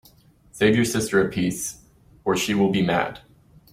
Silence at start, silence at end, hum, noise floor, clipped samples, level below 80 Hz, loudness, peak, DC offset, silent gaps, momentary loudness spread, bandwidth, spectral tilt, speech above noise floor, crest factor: 0.55 s; 0.55 s; none; -54 dBFS; under 0.1%; -52 dBFS; -22 LUFS; -6 dBFS; under 0.1%; none; 11 LU; 16.5 kHz; -4.5 dB/octave; 33 dB; 18 dB